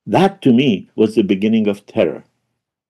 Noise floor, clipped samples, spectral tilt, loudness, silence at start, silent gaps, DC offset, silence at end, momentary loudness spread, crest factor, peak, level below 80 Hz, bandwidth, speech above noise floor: -74 dBFS; under 0.1%; -7.5 dB/octave; -16 LUFS; 0.05 s; none; under 0.1%; 0.7 s; 6 LU; 14 dB; -2 dBFS; -58 dBFS; 12 kHz; 59 dB